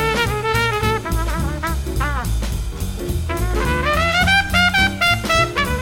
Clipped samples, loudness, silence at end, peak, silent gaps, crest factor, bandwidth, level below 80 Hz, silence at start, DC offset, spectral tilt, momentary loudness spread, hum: under 0.1%; -18 LUFS; 0 s; -2 dBFS; none; 16 dB; 17 kHz; -26 dBFS; 0 s; under 0.1%; -4 dB/octave; 10 LU; none